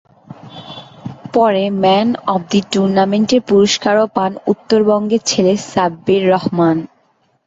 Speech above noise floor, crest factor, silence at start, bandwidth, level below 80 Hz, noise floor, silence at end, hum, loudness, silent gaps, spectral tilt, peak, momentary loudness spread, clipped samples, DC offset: 45 dB; 14 dB; 0.3 s; 8 kHz; -54 dBFS; -58 dBFS; 0.6 s; none; -14 LUFS; none; -5 dB/octave; -2 dBFS; 19 LU; under 0.1%; under 0.1%